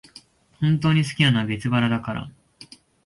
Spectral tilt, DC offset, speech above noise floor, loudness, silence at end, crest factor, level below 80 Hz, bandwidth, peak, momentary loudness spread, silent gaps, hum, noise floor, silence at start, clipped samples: -6 dB/octave; under 0.1%; 30 dB; -22 LUFS; 0.4 s; 18 dB; -54 dBFS; 11.5 kHz; -6 dBFS; 12 LU; none; none; -51 dBFS; 0.6 s; under 0.1%